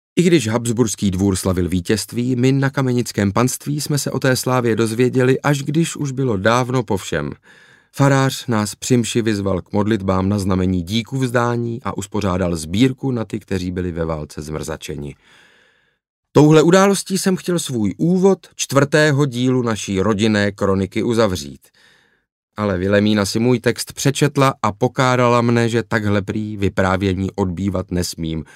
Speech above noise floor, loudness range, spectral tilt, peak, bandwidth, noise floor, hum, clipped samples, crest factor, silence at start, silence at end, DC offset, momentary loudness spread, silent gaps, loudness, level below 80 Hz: 40 dB; 4 LU; -5.5 dB/octave; -2 dBFS; 16 kHz; -58 dBFS; none; under 0.1%; 16 dB; 0.15 s; 0.1 s; under 0.1%; 9 LU; 16.09-16.23 s, 22.32-22.48 s; -18 LUFS; -46 dBFS